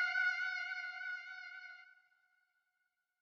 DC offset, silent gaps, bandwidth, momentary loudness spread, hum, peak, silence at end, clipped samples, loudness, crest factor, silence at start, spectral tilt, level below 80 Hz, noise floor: under 0.1%; none; 7 kHz; 18 LU; none; -26 dBFS; 1.25 s; under 0.1%; -39 LUFS; 18 dB; 0 s; 8 dB/octave; under -90 dBFS; -86 dBFS